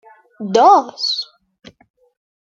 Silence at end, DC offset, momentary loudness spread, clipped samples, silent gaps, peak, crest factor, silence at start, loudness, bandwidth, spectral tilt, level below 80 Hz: 1.3 s; under 0.1%; 19 LU; under 0.1%; none; 0 dBFS; 18 dB; 0.4 s; -14 LUFS; 7.6 kHz; -4 dB/octave; -66 dBFS